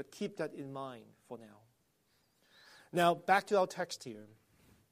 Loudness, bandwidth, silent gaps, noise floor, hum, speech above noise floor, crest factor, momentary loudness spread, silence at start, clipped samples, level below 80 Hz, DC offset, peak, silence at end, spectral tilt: -34 LUFS; 15 kHz; none; -75 dBFS; none; 40 dB; 24 dB; 22 LU; 0 s; under 0.1%; -80 dBFS; under 0.1%; -14 dBFS; 0.65 s; -4.5 dB/octave